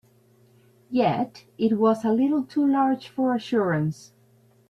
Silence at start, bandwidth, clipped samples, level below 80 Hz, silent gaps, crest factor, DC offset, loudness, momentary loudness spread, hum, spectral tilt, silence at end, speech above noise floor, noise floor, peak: 0.9 s; 12.5 kHz; under 0.1%; -66 dBFS; none; 14 dB; under 0.1%; -24 LUFS; 8 LU; none; -7.5 dB/octave; 0.75 s; 36 dB; -59 dBFS; -10 dBFS